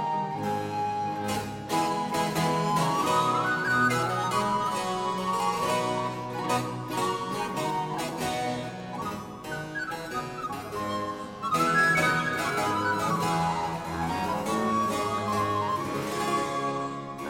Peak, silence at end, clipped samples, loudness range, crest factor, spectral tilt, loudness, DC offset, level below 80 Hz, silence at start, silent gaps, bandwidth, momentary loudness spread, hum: -12 dBFS; 0 s; under 0.1%; 6 LU; 16 dB; -4.5 dB/octave; -28 LUFS; under 0.1%; -58 dBFS; 0 s; none; 16.5 kHz; 9 LU; none